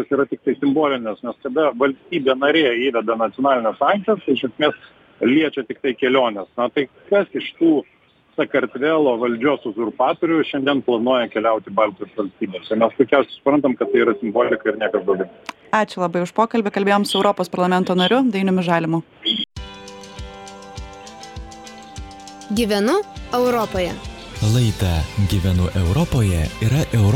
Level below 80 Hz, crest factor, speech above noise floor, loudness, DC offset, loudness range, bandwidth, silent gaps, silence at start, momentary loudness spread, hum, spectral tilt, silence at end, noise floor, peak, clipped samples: -38 dBFS; 18 dB; 19 dB; -19 LUFS; under 0.1%; 5 LU; 18 kHz; none; 0 s; 18 LU; none; -6 dB/octave; 0 s; -38 dBFS; -2 dBFS; under 0.1%